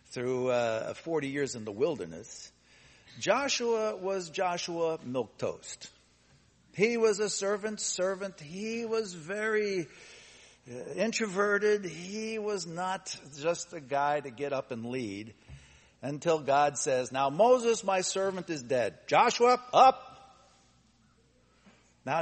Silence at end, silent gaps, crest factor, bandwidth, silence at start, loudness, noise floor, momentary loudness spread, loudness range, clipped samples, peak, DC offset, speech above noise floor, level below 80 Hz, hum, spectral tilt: 0 s; none; 22 dB; 8.8 kHz; 0.1 s; -30 LUFS; -66 dBFS; 18 LU; 7 LU; under 0.1%; -8 dBFS; under 0.1%; 36 dB; -70 dBFS; none; -3.5 dB/octave